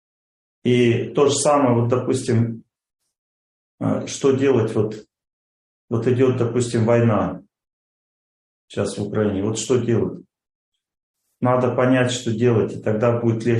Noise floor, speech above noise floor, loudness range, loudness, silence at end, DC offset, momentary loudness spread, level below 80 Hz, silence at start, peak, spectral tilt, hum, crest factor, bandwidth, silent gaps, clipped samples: under -90 dBFS; over 71 dB; 5 LU; -20 LUFS; 0 s; under 0.1%; 10 LU; -58 dBFS; 0.65 s; -4 dBFS; -6 dB/octave; none; 16 dB; 11.5 kHz; 3.18-3.78 s, 5.33-5.88 s, 7.73-8.68 s, 10.55-10.72 s, 11.03-11.14 s; under 0.1%